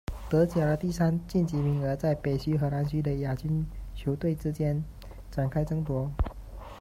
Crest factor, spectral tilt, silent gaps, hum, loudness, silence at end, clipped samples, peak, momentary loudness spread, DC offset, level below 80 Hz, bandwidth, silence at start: 16 dB; -8.5 dB/octave; none; none; -29 LUFS; 0 s; under 0.1%; -12 dBFS; 9 LU; under 0.1%; -42 dBFS; 15 kHz; 0.1 s